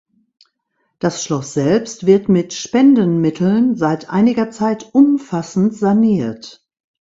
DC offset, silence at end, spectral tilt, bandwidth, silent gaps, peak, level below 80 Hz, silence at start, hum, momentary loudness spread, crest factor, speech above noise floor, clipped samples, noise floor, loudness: under 0.1%; 0.5 s; -6.5 dB/octave; 7.8 kHz; none; 0 dBFS; -56 dBFS; 1.05 s; none; 8 LU; 14 dB; 54 dB; under 0.1%; -69 dBFS; -15 LUFS